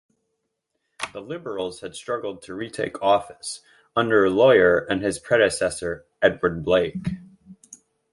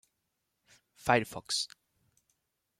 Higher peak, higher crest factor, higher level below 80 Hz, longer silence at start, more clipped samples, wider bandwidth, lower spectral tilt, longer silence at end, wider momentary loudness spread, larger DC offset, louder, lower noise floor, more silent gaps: first, -4 dBFS vs -10 dBFS; second, 20 dB vs 26 dB; first, -52 dBFS vs -68 dBFS; about the same, 1 s vs 1.05 s; neither; second, 11.5 kHz vs 16 kHz; first, -4.5 dB/octave vs -3 dB/octave; second, 0.4 s vs 1.15 s; first, 17 LU vs 10 LU; neither; first, -22 LUFS vs -32 LUFS; second, -77 dBFS vs -82 dBFS; neither